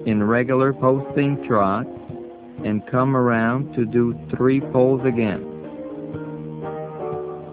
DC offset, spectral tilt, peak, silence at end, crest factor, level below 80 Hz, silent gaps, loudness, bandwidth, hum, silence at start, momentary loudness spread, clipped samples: under 0.1%; -12 dB/octave; -4 dBFS; 0 s; 16 dB; -52 dBFS; none; -21 LUFS; 4 kHz; none; 0 s; 15 LU; under 0.1%